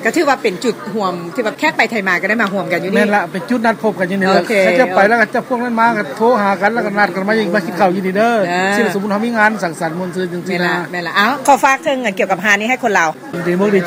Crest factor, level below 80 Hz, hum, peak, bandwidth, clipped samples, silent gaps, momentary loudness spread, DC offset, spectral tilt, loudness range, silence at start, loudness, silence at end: 14 dB; -60 dBFS; none; 0 dBFS; 16 kHz; under 0.1%; none; 8 LU; under 0.1%; -5 dB/octave; 2 LU; 0 s; -14 LUFS; 0 s